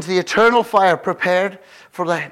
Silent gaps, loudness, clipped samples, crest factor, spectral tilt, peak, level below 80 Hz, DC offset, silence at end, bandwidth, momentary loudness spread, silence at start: none; -17 LUFS; under 0.1%; 14 dB; -4.5 dB/octave; -4 dBFS; -60 dBFS; under 0.1%; 0 s; 15.5 kHz; 11 LU; 0 s